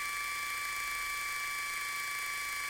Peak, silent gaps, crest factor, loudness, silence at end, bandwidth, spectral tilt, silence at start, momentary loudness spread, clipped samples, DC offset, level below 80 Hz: -24 dBFS; none; 14 dB; -35 LUFS; 0 s; 17 kHz; 1.5 dB/octave; 0 s; 0 LU; under 0.1%; under 0.1%; -64 dBFS